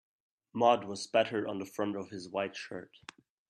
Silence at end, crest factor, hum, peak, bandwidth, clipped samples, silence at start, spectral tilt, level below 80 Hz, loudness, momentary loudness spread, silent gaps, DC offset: 0.65 s; 24 dB; none; -12 dBFS; 13 kHz; under 0.1%; 0.55 s; -4.5 dB/octave; -78 dBFS; -33 LUFS; 19 LU; none; under 0.1%